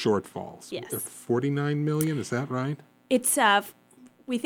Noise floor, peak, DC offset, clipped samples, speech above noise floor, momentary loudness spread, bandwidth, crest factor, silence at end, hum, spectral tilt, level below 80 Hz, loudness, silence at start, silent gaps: -55 dBFS; -8 dBFS; under 0.1%; under 0.1%; 28 dB; 18 LU; 19.5 kHz; 20 dB; 0 s; none; -4.5 dB/octave; -72 dBFS; -26 LUFS; 0 s; none